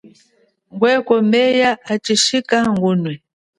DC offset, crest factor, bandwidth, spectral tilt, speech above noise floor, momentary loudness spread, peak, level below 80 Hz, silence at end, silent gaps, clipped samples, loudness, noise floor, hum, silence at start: under 0.1%; 16 dB; 11.5 kHz; -4 dB/octave; 43 dB; 10 LU; 0 dBFS; -58 dBFS; 0.4 s; none; under 0.1%; -16 LUFS; -59 dBFS; none; 0.75 s